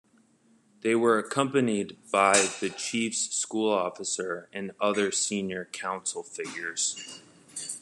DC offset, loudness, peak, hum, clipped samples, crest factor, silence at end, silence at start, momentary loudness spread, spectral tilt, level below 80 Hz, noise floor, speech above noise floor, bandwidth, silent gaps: under 0.1%; -27 LUFS; -6 dBFS; none; under 0.1%; 22 dB; 0 s; 0.85 s; 13 LU; -2.5 dB/octave; -78 dBFS; -63 dBFS; 35 dB; 12.5 kHz; none